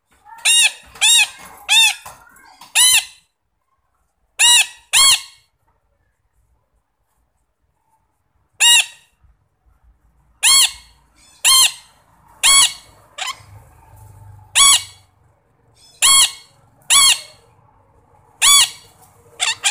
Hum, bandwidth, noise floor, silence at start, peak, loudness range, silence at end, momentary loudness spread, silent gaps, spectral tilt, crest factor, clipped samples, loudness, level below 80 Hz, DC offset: none; 16.5 kHz; -69 dBFS; 0.45 s; 0 dBFS; 5 LU; 0 s; 11 LU; none; 4 dB/octave; 18 dB; under 0.1%; -12 LUFS; -54 dBFS; under 0.1%